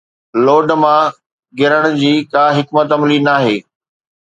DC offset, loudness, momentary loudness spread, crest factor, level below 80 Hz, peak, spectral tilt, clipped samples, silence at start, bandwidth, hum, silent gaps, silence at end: under 0.1%; -13 LUFS; 7 LU; 14 dB; -62 dBFS; 0 dBFS; -6.5 dB/octave; under 0.1%; 0.35 s; 8 kHz; none; 1.26-1.38 s; 0.6 s